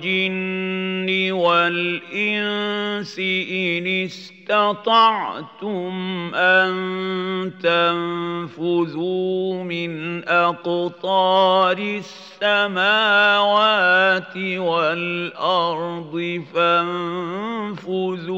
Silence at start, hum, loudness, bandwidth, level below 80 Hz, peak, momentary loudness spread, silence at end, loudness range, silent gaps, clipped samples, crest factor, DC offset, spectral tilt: 0 s; none; -20 LUFS; 7.8 kHz; -78 dBFS; -4 dBFS; 11 LU; 0 s; 5 LU; none; under 0.1%; 16 dB; under 0.1%; -5.5 dB/octave